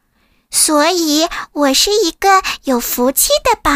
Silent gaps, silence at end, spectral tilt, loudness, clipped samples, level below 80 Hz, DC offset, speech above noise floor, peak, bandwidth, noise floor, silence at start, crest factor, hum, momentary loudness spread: none; 0 s; -1 dB/octave; -13 LUFS; under 0.1%; -38 dBFS; under 0.1%; 44 dB; 0 dBFS; 16 kHz; -58 dBFS; 0.5 s; 14 dB; none; 6 LU